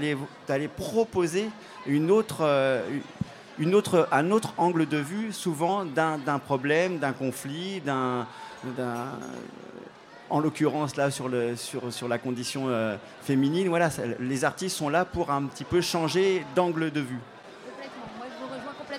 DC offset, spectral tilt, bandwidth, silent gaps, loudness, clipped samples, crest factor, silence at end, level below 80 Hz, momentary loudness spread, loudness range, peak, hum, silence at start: under 0.1%; -5.5 dB/octave; 16 kHz; none; -27 LUFS; under 0.1%; 18 dB; 0 s; -62 dBFS; 15 LU; 5 LU; -10 dBFS; none; 0 s